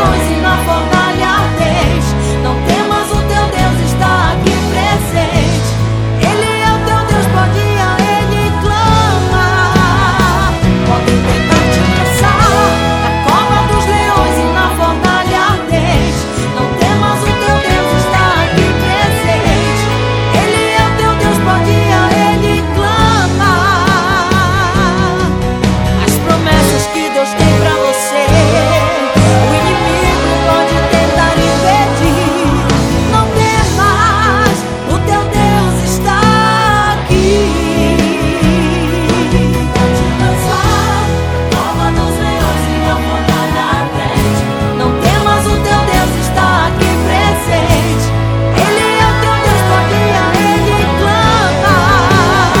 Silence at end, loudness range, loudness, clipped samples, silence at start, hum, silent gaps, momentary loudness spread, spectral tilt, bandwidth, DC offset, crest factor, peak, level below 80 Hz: 0 s; 2 LU; -11 LUFS; 0.3%; 0 s; none; none; 4 LU; -5 dB/octave; 19 kHz; under 0.1%; 10 dB; 0 dBFS; -22 dBFS